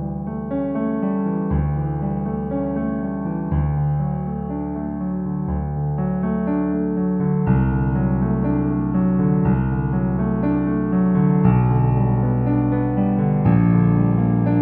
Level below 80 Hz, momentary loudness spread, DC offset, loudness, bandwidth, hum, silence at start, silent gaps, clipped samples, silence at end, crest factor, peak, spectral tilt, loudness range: -32 dBFS; 8 LU; under 0.1%; -20 LUFS; 3.1 kHz; none; 0 s; none; under 0.1%; 0 s; 16 dB; -4 dBFS; -13.5 dB/octave; 6 LU